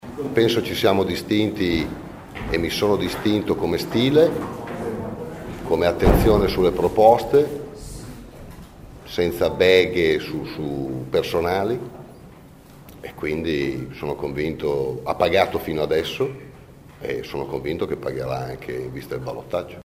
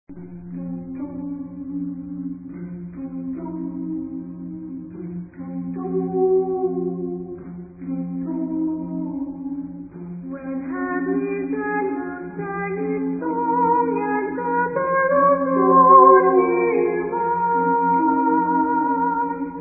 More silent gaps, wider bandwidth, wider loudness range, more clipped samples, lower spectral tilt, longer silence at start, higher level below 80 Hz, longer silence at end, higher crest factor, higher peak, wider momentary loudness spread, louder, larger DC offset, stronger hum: neither; first, 16 kHz vs 2.7 kHz; second, 8 LU vs 15 LU; neither; second, -6 dB/octave vs -15 dB/octave; about the same, 0.05 s vs 0.1 s; first, -38 dBFS vs -56 dBFS; about the same, 0 s vs 0 s; about the same, 20 dB vs 20 dB; about the same, -2 dBFS vs 0 dBFS; about the same, 17 LU vs 17 LU; about the same, -22 LUFS vs -21 LUFS; neither; neither